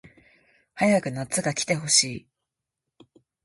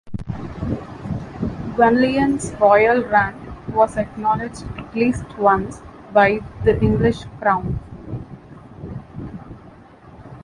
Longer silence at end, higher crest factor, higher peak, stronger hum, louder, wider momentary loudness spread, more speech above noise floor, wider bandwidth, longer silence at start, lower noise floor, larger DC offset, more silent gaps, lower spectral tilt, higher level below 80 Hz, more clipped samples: first, 1.25 s vs 0 s; first, 24 dB vs 18 dB; about the same, -4 dBFS vs -2 dBFS; neither; second, -23 LUFS vs -19 LUFS; second, 9 LU vs 19 LU; first, 61 dB vs 26 dB; about the same, 11.5 kHz vs 11.5 kHz; first, 0.75 s vs 0.05 s; first, -85 dBFS vs -44 dBFS; neither; neither; second, -3 dB/octave vs -7 dB/octave; second, -64 dBFS vs -38 dBFS; neither